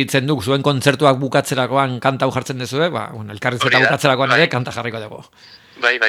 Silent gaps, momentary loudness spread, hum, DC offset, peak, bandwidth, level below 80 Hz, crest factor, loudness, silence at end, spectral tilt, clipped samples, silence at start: none; 11 LU; none; under 0.1%; 0 dBFS; 16 kHz; -58 dBFS; 18 dB; -17 LUFS; 0 s; -5 dB/octave; under 0.1%; 0 s